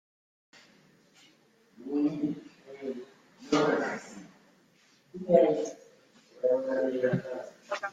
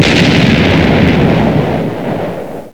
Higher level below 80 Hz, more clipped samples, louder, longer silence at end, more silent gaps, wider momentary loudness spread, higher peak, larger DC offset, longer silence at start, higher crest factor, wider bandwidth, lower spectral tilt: second, -74 dBFS vs -28 dBFS; neither; second, -30 LUFS vs -10 LUFS; about the same, 0 s vs 0 s; neither; first, 23 LU vs 10 LU; second, -8 dBFS vs 0 dBFS; second, under 0.1% vs 2%; first, 1.8 s vs 0 s; first, 24 dB vs 10 dB; second, 9 kHz vs 18.5 kHz; about the same, -6 dB/octave vs -6.5 dB/octave